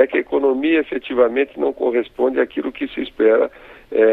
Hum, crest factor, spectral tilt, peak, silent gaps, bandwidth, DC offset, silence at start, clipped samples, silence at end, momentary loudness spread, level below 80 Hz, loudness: none; 18 dB; -7 dB/octave; 0 dBFS; none; 4.2 kHz; under 0.1%; 0 s; under 0.1%; 0 s; 8 LU; -52 dBFS; -19 LUFS